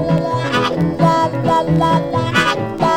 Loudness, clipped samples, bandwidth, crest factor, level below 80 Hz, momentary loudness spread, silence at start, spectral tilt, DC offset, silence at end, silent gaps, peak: -16 LUFS; under 0.1%; 13.5 kHz; 14 dB; -40 dBFS; 3 LU; 0 s; -6 dB/octave; 0.2%; 0 s; none; -2 dBFS